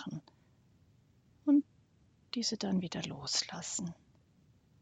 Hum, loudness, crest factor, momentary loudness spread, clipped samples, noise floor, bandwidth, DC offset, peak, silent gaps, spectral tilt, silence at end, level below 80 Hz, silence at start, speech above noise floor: none; -35 LUFS; 20 dB; 15 LU; under 0.1%; -68 dBFS; 9.4 kHz; under 0.1%; -18 dBFS; none; -4 dB/octave; 0.9 s; -72 dBFS; 0 s; 31 dB